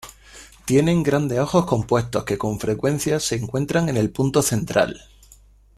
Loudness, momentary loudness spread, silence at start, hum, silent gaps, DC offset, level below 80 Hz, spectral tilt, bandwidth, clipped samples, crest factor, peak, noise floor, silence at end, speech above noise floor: -21 LUFS; 6 LU; 0.05 s; none; none; under 0.1%; -46 dBFS; -5.5 dB/octave; 15 kHz; under 0.1%; 16 dB; -4 dBFS; -51 dBFS; 0.8 s; 30 dB